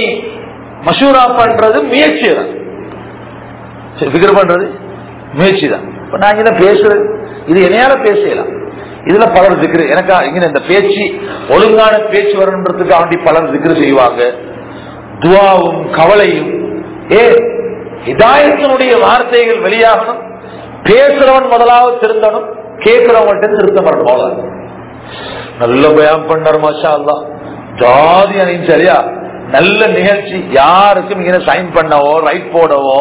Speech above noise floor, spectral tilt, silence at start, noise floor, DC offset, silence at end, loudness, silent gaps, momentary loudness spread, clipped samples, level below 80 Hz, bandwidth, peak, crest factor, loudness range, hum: 20 dB; -9 dB/octave; 0 s; -28 dBFS; under 0.1%; 0 s; -8 LUFS; none; 19 LU; 4%; -42 dBFS; 4 kHz; 0 dBFS; 8 dB; 3 LU; none